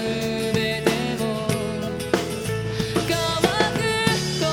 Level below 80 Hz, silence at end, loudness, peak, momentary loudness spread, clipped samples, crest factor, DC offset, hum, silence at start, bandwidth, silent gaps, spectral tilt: -44 dBFS; 0 s; -23 LUFS; -2 dBFS; 6 LU; under 0.1%; 20 dB; under 0.1%; none; 0 s; 18.5 kHz; none; -4.5 dB/octave